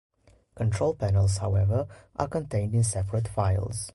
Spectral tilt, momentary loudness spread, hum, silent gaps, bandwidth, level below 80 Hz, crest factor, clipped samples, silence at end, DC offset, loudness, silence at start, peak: -6.5 dB/octave; 6 LU; none; none; 11.5 kHz; -40 dBFS; 16 dB; under 0.1%; 0.05 s; under 0.1%; -27 LUFS; 0.55 s; -10 dBFS